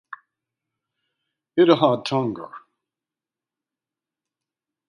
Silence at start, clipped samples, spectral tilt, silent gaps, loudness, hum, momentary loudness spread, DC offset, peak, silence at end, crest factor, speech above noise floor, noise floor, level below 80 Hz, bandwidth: 0.1 s; under 0.1%; -7 dB/octave; none; -20 LUFS; none; 18 LU; under 0.1%; -2 dBFS; 2.3 s; 24 dB; 70 dB; -89 dBFS; -72 dBFS; 11 kHz